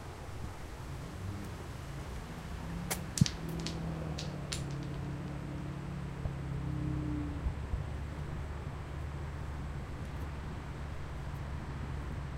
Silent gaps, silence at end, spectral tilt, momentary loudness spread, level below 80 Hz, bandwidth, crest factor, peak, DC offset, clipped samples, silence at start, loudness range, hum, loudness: none; 0 s; -5.5 dB/octave; 7 LU; -44 dBFS; 16 kHz; 28 dB; -10 dBFS; under 0.1%; under 0.1%; 0 s; 5 LU; none; -40 LUFS